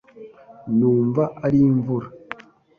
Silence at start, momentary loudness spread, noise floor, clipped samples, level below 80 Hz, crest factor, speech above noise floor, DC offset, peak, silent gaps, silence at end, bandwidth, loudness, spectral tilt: 0.15 s; 20 LU; -43 dBFS; under 0.1%; -54 dBFS; 14 dB; 25 dB; under 0.1%; -8 dBFS; none; 0.45 s; 4.9 kHz; -20 LUFS; -11 dB/octave